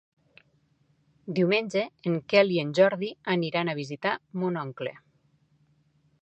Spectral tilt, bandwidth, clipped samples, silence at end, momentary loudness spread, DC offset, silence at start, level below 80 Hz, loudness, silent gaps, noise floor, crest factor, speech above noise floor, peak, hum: -6.5 dB/octave; 8.4 kHz; under 0.1%; 1.3 s; 11 LU; under 0.1%; 1.25 s; -74 dBFS; -27 LUFS; none; -67 dBFS; 22 dB; 41 dB; -6 dBFS; none